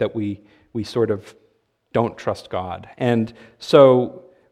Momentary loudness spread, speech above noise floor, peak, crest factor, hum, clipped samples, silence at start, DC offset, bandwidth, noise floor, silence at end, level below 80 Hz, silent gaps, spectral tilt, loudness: 18 LU; 44 dB; 0 dBFS; 20 dB; none; under 0.1%; 0 s; under 0.1%; 11.5 kHz; -63 dBFS; 0.35 s; -60 dBFS; none; -7 dB/octave; -20 LUFS